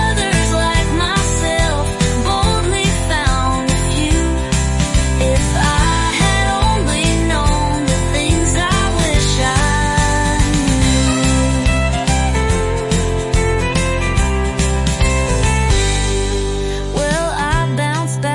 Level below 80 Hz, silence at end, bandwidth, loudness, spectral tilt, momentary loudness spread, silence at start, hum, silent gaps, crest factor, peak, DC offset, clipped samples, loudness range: -20 dBFS; 0 s; 11.5 kHz; -15 LUFS; -4.5 dB/octave; 3 LU; 0 s; none; none; 12 dB; -2 dBFS; under 0.1%; under 0.1%; 2 LU